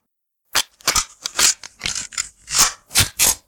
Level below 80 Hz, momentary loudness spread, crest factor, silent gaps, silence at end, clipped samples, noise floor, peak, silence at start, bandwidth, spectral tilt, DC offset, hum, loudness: -42 dBFS; 9 LU; 20 dB; none; 0.1 s; under 0.1%; -73 dBFS; 0 dBFS; 0.55 s; 19 kHz; 0.5 dB/octave; under 0.1%; none; -18 LUFS